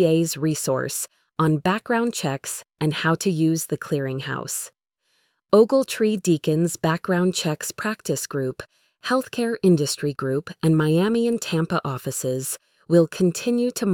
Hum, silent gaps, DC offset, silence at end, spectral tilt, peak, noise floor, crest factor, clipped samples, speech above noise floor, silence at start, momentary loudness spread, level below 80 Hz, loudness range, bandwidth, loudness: none; none; under 0.1%; 0 s; -5.5 dB/octave; -4 dBFS; -70 dBFS; 20 dB; under 0.1%; 48 dB; 0 s; 9 LU; -62 dBFS; 3 LU; 19 kHz; -23 LUFS